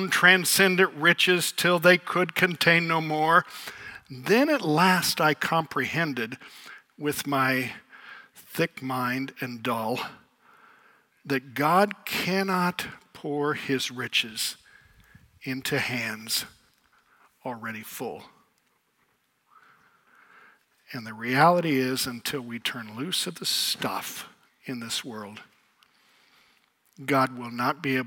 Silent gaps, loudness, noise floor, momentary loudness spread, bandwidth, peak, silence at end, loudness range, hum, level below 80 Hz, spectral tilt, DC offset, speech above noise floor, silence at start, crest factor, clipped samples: none; -25 LUFS; -70 dBFS; 19 LU; 17.5 kHz; -2 dBFS; 0 s; 13 LU; none; -72 dBFS; -3.5 dB/octave; under 0.1%; 44 dB; 0 s; 24 dB; under 0.1%